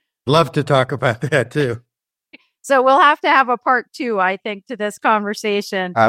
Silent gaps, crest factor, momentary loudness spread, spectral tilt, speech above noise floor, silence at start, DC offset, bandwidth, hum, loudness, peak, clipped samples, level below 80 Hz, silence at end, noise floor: none; 16 dB; 12 LU; -5.5 dB/octave; 34 dB; 0.25 s; under 0.1%; 15.5 kHz; none; -17 LUFS; -2 dBFS; under 0.1%; -60 dBFS; 0 s; -50 dBFS